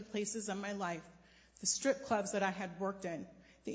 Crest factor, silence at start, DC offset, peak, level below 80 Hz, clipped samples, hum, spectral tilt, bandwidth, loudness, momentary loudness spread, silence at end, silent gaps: 20 dB; 0 s; under 0.1%; -20 dBFS; -72 dBFS; under 0.1%; none; -3 dB/octave; 8 kHz; -38 LUFS; 13 LU; 0 s; none